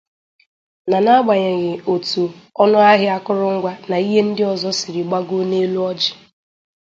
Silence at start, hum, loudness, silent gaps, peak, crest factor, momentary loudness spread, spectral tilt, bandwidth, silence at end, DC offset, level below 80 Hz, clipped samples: 0.85 s; none; -17 LUFS; none; 0 dBFS; 18 dB; 9 LU; -5 dB/octave; 7.8 kHz; 0.7 s; under 0.1%; -66 dBFS; under 0.1%